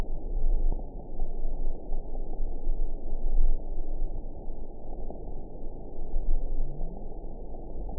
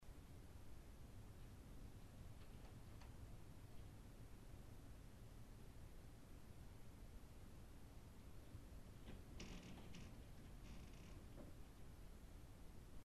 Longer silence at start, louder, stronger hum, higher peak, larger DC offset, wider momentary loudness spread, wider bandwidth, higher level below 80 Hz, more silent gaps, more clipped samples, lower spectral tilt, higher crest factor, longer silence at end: about the same, 0 s vs 0 s; first, -38 LUFS vs -62 LUFS; neither; first, -10 dBFS vs -42 dBFS; first, 0.3% vs under 0.1%; first, 11 LU vs 4 LU; second, 1 kHz vs 13 kHz; first, -28 dBFS vs -62 dBFS; neither; neither; first, -15.5 dB/octave vs -5.5 dB/octave; about the same, 14 dB vs 16 dB; about the same, 0 s vs 0 s